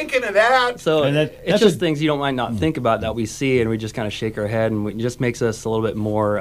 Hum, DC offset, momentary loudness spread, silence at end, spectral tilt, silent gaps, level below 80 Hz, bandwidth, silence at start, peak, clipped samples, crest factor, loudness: none; under 0.1%; 9 LU; 0 s; -5.5 dB/octave; none; -46 dBFS; 15.5 kHz; 0 s; -2 dBFS; under 0.1%; 18 dB; -20 LUFS